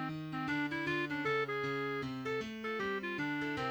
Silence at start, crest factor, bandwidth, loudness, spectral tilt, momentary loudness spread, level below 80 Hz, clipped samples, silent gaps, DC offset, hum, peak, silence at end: 0 s; 14 dB; over 20 kHz; -37 LUFS; -6 dB/octave; 4 LU; -68 dBFS; under 0.1%; none; under 0.1%; none; -24 dBFS; 0 s